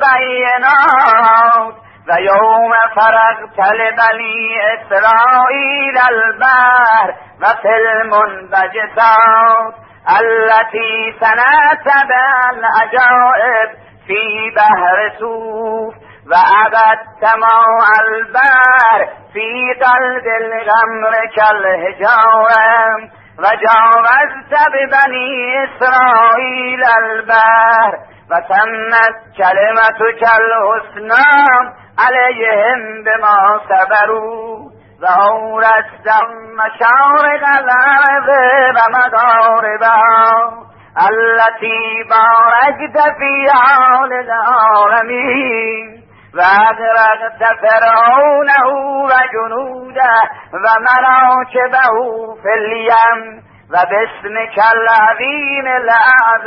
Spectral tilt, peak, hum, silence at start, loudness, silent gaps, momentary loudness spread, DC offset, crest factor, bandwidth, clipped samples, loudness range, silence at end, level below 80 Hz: -5 dB/octave; 0 dBFS; none; 0 s; -10 LUFS; none; 9 LU; under 0.1%; 10 dB; 5.8 kHz; under 0.1%; 3 LU; 0 s; -58 dBFS